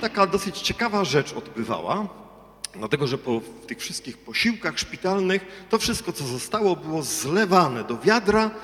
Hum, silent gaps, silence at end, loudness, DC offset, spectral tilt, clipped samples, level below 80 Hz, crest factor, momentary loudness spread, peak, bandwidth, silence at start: none; none; 0 s; -24 LUFS; under 0.1%; -4 dB/octave; under 0.1%; -52 dBFS; 20 dB; 13 LU; -4 dBFS; 18 kHz; 0 s